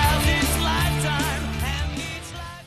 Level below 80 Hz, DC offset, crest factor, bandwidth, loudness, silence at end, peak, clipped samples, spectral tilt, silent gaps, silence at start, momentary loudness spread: -30 dBFS; under 0.1%; 16 dB; 14 kHz; -23 LUFS; 0 s; -6 dBFS; under 0.1%; -4 dB/octave; none; 0 s; 11 LU